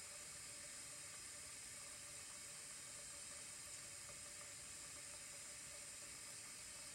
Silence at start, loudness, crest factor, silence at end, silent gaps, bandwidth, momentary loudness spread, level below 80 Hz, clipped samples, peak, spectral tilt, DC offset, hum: 0 s; -52 LUFS; 16 dB; 0 s; none; 16 kHz; 1 LU; -78 dBFS; under 0.1%; -40 dBFS; 0 dB/octave; under 0.1%; none